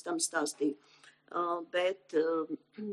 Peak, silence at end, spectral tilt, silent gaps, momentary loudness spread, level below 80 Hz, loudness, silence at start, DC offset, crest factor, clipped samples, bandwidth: -18 dBFS; 0 s; -2.5 dB/octave; none; 9 LU; under -90 dBFS; -34 LUFS; 0.05 s; under 0.1%; 16 dB; under 0.1%; 13 kHz